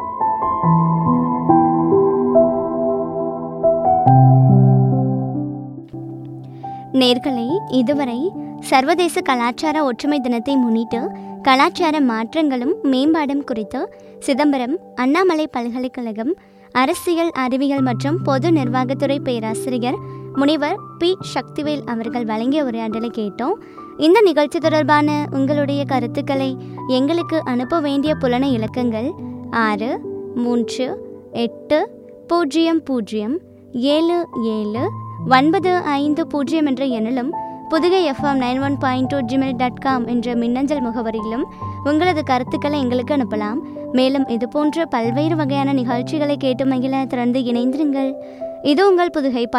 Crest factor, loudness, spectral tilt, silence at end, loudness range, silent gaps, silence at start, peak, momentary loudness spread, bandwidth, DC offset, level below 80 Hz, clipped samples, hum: 18 dB; -18 LUFS; -7 dB/octave; 0 s; 5 LU; none; 0 s; 0 dBFS; 10 LU; 13.5 kHz; under 0.1%; -54 dBFS; under 0.1%; none